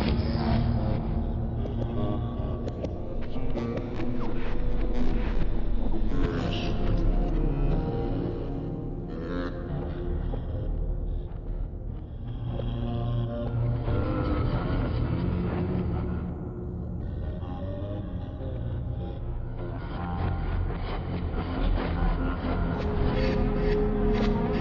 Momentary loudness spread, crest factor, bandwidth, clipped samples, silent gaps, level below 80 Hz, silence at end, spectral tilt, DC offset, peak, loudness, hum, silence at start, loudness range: 9 LU; 14 dB; 6 kHz; under 0.1%; none; -32 dBFS; 0 s; -7.5 dB/octave; under 0.1%; -12 dBFS; -31 LUFS; none; 0 s; 5 LU